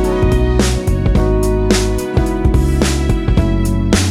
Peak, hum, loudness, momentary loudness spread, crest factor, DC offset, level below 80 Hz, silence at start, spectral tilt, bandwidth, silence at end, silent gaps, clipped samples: 0 dBFS; none; -15 LUFS; 2 LU; 12 dB; under 0.1%; -16 dBFS; 0 s; -6 dB/octave; 15 kHz; 0 s; none; under 0.1%